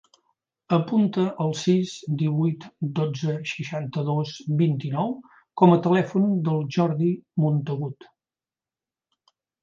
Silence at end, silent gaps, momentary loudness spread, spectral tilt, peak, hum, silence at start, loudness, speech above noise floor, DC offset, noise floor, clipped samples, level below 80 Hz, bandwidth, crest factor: 1.7 s; none; 10 LU; -7.5 dB/octave; -2 dBFS; none; 0.7 s; -24 LUFS; over 67 dB; under 0.1%; under -90 dBFS; under 0.1%; -70 dBFS; 7.6 kHz; 22 dB